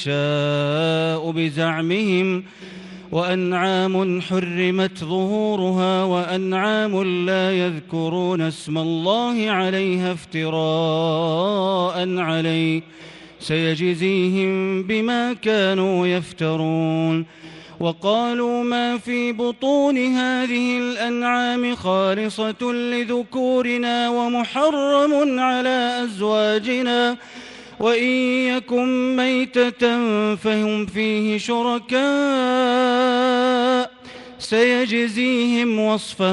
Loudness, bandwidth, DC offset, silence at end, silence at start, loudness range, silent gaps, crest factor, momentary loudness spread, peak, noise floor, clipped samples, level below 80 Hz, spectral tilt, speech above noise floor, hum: -20 LUFS; 11.5 kHz; under 0.1%; 0 s; 0 s; 3 LU; none; 16 dB; 6 LU; -4 dBFS; -40 dBFS; under 0.1%; -62 dBFS; -6 dB/octave; 20 dB; none